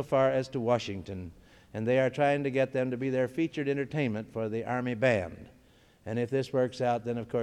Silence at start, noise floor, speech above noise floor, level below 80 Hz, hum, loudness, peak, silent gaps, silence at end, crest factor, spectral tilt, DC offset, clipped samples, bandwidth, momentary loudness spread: 0 s; -61 dBFS; 31 dB; -62 dBFS; none; -30 LUFS; -14 dBFS; none; 0 s; 16 dB; -7 dB/octave; under 0.1%; under 0.1%; 12 kHz; 13 LU